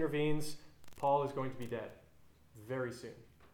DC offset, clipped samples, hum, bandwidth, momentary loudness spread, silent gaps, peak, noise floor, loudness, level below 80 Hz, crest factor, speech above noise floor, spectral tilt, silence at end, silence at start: under 0.1%; under 0.1%; none; 19.5 kHz; 20 LU; none; -20 dBFS; -63 dBFS; -38 LUFS; -62 dBFS; 18 dB; 27 dB; -6 dB/octave; 0.1 s; 0 s